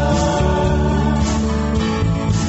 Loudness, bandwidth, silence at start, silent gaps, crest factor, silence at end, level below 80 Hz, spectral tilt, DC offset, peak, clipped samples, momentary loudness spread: -18 LUFS; 8.2 kHz; 0 s; none; 14 dB; 0 s; -22 dBFS; -6 dB/octave; under 0.1%; -2 dBFS; under 0.1%; 2 LU